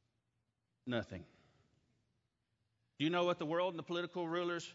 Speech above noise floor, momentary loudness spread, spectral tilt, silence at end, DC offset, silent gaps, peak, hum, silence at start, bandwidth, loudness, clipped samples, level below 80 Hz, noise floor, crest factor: 47 dB; 13 LU; -4 dB/octave; 0 s; under 0.1%; none; -22 dBFS; none; 0.85 s; 7.6 kHz; -38 LUFS; under 0.1%; -78 dBFS; -85 dBFS; 20 dB